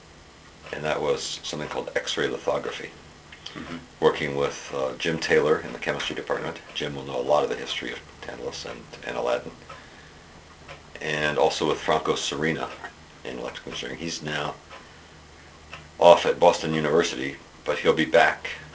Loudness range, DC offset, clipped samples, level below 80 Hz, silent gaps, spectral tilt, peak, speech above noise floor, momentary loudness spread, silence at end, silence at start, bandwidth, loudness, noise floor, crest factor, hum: 9 LU; under 0.1%; under 0.1%; -54 dBFS; none; -4 dB/octave; 0 dBFS; 24 dB; 21 LU; 0 s; 0.05 s; 8 kHz; -25 LUFS; -49 dBFS; 26 dB; none